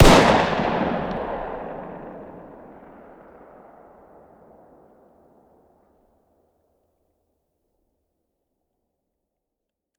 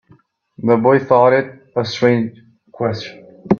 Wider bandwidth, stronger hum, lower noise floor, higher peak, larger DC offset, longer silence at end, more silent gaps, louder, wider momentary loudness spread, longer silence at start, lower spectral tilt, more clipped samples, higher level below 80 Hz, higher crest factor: first, 18.5 kHz vs 7 kHz; neither; first, -83 dBFS vs -52 dBFS; about the same, 0 dBFS vs 0 dBFS; neither; first, 7.55 s vs 0 s; neither; second, -21 LUFS vs -16 LUFS; first, 29 LU vs 13 LU; second, 0 s vs 0.6 s; second, -5 dB/octave vs -7 dB/octave; neither; first, -34 dBFS vs -58 dBFS; first, 24 dB vs 16 dB